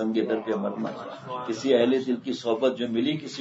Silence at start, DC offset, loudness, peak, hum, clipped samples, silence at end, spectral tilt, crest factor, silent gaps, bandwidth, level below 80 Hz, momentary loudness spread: 0 s; under 0.1%; -26 LUFS; -10 dBFS; none; under 0.1%; 0 s; -5.5 dB/octave; 16 dB; none; 8 kHz; -74 dBFS; 12 LU